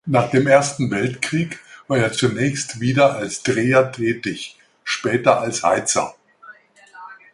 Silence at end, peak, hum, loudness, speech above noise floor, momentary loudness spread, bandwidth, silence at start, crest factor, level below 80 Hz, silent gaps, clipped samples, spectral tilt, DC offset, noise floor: 0.2 s; -2 dBFS; none; -19 LUFS; 27 dB; 14 LU; 11.5 kHz; 0.05 s; 18 dB; -56 dBFS; none; under 0.1%; -4.5 dB/octave; under 0.1%; -46 dBFS